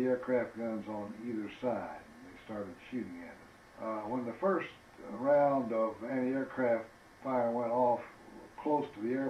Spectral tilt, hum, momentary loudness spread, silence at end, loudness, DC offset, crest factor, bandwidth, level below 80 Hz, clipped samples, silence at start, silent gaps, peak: -7.5 dB/octave; none; 20 LU; 0 s; -35 LUFS; under 0.1%; 16 dB; 11.5 kHz; -72 dBFS; under 0.1%; 0 s; none; -18 dBFS